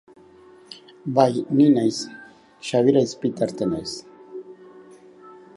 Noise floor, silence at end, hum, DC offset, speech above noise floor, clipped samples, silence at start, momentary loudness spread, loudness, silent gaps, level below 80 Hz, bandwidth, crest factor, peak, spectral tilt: -49 dBFS; 0.25 s; none; under 0.1%; 29 dB; under 0.1%; 0.7 s; 23 LU; -21 LUFS; none; -62 dBFS; 11.5 kHz; 20 dB; -2 dBFS; -6 dB/octave